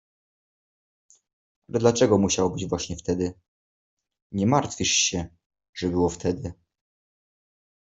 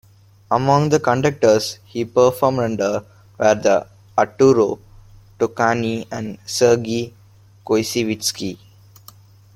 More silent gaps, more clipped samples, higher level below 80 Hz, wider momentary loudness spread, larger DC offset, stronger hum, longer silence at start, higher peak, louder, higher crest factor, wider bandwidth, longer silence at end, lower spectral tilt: first, 3.48-3.97 s, 4.22-4.30 s, 5.46-5.50 s, 5.69-5.73 s vs none; neither; about the same, -54 dBFS vs -54 dBFS; about the same, 13 LU vs 11 LU; neither; neither; first, 1.7 s vs 0.5 s; about the same, -4 dBFS vs -2 dBFS; second, -24 LUFS vs -18 LUFS; first, 24 dB vs 18 dB; second, 8.2 kHz vs 16.5 kHz; first, 1.4 s vs 1 s; about the same, -4 dB/octave vs -5 dB/octave